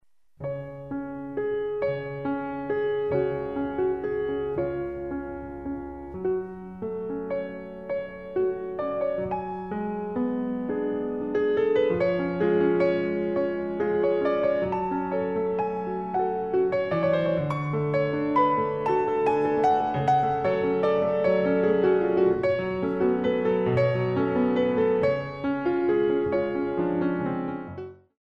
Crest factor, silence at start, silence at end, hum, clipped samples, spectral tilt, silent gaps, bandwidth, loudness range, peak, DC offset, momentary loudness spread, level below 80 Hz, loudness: 14 dB; 0.4 s; 0.25 s; none; under 0.1%; -9 dB/octave; none; 6.8 kHz; 7 LU; -10 dBFS; 0.1%; 11 LU; -56 dBFS; -26 LUFS